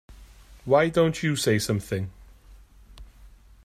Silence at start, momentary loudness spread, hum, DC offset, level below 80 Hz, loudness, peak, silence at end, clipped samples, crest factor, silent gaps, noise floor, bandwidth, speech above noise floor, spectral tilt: 0.1 s; 13 LU; none; under 0.1%; -50 dBFS; -24 LUFS; -6 dBFS; 0.35 s; under 0.1%; 20 dB; none; -51 dBFS; 15.5 kHz; 28 dB; -5 dB/octave